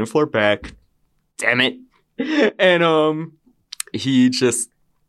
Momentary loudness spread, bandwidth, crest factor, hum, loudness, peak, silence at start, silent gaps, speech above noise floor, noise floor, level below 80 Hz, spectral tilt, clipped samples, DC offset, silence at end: 14 LU; 13 kHz; 18 dB; none; -18 LUFS; -2 dBFS; 0 s; none; 47 dB; -64 dBFS; -54 dBFS; -4 dB/octave; under 0.1%; under 0.1%; 0.45 s